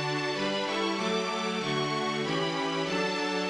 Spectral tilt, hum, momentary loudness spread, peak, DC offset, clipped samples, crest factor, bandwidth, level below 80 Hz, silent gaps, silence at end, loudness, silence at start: -4 dB/octave; none; 1 LU; -16 dBFS; under 0.1%; under 0.1%; 14 dB; 12.5 kHz; -68 dBFS; none; 0 s; -29 LUFS; 0 s